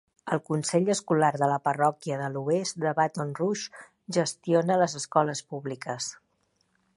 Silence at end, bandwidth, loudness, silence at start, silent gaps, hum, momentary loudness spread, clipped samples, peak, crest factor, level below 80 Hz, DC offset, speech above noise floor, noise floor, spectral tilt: 0.8 s; 11.5 kHz; -27 LUFS; 0.25 s; none; none; 10 LU; under 0.1%; -8 dBFS; 20 dB; -74 dBFS; under 0.1%; 45 dB; -72 dBFS; -5 dB/octave